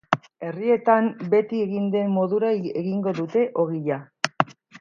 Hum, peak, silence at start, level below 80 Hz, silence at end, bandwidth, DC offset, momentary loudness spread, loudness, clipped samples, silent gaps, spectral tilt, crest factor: none; 0 dBFS; 0.1 s; -70 dBFS; 0.05 s; 8.8 kHz; under 0.1%; 7 LU; -23 LUFS; under 0.1%; none; -6.5 dB/octave; 22 dB